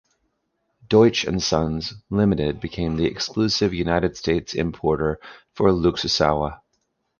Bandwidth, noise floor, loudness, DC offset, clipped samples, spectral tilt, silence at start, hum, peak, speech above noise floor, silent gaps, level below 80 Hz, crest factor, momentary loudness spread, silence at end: 7.2 kHz; -73 dBFS; -22 LUFS; under 0.1%; under 0.1%; -5.5 dB/octave; 0.9 s; none; -2 dBFS; 52 dB; none; -40 dBFS; 20 dB; 8 LU; 0.65 s